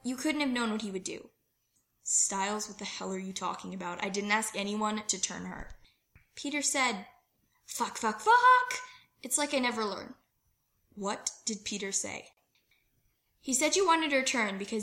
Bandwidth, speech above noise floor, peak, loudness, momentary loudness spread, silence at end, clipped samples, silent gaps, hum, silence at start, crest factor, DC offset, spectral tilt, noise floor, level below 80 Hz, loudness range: 16.5 kHz; 45 dB; -12 dBFS; -30 LUFS; 16 LU; 0 s; under 0.1%; none; none; 0.05 s; 20 dB; under 0.1%; -2 dB/octave; -76 dBFS; -64 dBFS; 6 LU